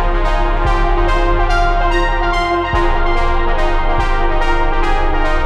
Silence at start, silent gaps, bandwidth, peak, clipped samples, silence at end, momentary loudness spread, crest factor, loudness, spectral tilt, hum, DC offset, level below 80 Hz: 0 s; none; 7.6 kHz; -2 dBFS; under 0.1%; 0 s; 2 LU; 10 dB; -16 LUFS; -6 dB/octave; none; under 0.1%; -14 dBFS